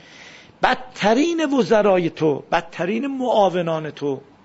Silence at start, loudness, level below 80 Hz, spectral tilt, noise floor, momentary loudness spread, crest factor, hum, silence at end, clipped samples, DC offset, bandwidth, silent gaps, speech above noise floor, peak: 0.2 s; -20 LUFS; -54 dBFS; -5.5 dB/octave; -44 dBFS; 8 LU; 18 dB; none; 0.25 s; under 0.1%; under 0.1%; 8 kHz; none; 24 dB; -2 dBFS